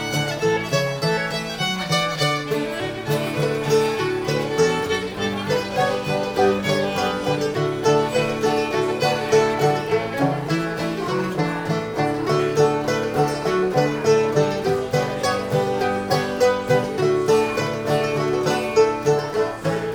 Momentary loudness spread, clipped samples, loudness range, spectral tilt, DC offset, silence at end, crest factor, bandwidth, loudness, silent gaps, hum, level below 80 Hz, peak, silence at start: 5 LU; under 0.1%; 2 LU; -5 dB/octave; under 0.1%; 0 s; 16 dB; over 20 kHz; -21 LUFS; none; none; -50 dBFS; -4 dBFS; 0 s